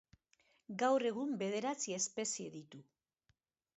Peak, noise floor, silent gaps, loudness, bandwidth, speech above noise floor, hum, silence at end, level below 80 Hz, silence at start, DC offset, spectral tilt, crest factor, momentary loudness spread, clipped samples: -22 dBFS; -81 dBFS; none; -37 LUFS; 8 kHz; 43 dB; none; 0.95 s; -84 dBFS; 0.7 s; under 0.1%; -3.5 dB/octave; 20 dB; 16 LU; under 0.1%